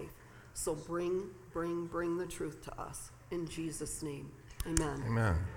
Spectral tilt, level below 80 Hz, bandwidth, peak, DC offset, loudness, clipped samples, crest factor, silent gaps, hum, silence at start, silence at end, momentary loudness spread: -5.5 dB/octave; -50 dBFS; 18 kHz; -12 dBFS; under 0.1%; -38 LUFS; under 0.1%; 26 dB; none; none; 0 s; 0 s; 13 LU